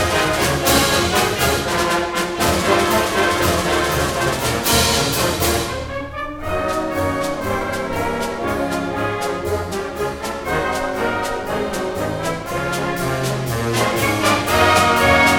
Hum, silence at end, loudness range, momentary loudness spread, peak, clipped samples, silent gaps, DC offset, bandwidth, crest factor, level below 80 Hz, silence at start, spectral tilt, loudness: none; 0 s; 6 LU; 9 LU; -2 dBFS; under 0.1%; none; under 0.1%; 19 kHz; 18 dB; -34 dBFS; 0 s; -3.5 dB/octave; -18 LUFS